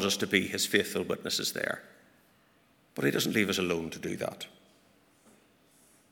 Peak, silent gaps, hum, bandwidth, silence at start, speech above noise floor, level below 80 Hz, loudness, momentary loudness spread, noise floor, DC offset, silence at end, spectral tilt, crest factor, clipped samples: -8 dBFS; none; none; 19.5 kHz; 0 s; 35 dB; -70 dBFS; -30 LUFS; 12 LU; -65 dBFS; under 0.1%; 1.65 s; -3 dB/octave; 24 dB; under 0.1%